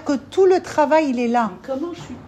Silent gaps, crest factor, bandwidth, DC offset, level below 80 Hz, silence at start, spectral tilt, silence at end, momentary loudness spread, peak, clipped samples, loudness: none; 14 dB; 9.4 kHz; under 0.1%; -56 dBFS; 0 s; -5.5 dB/octave; 0 s; 11 LU; -4 dBFS; under 0.1%; -19 LUFS